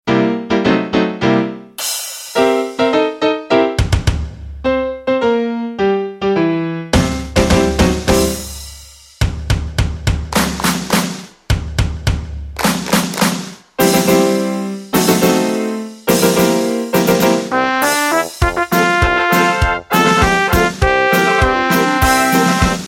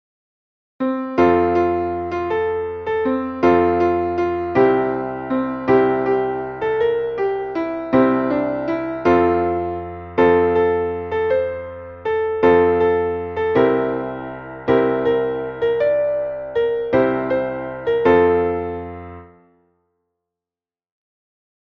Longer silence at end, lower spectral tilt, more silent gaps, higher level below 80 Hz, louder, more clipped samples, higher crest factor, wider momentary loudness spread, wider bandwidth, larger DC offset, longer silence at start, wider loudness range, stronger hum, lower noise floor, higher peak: second, 0 s vs 2.4 s; second, -4.5 dB/octave vs -8.5 dB/octave; neither; first, -26 dBFS vs -48 dBFS; first, -15 LUFS vs -19 LUFS; neither; about the same, 14 dB vs 16 dB; about the same, 9 LU vs 10 LU; first, 16.5 kHz vs 6.2 kHz; neither; second, 0.05 s vs 0.8 s; first, 5 LU vs 2 LU; neither; second, -38 dBFS vs under -90 dBFS; about the same, 0 dBFS vs -2 dBFS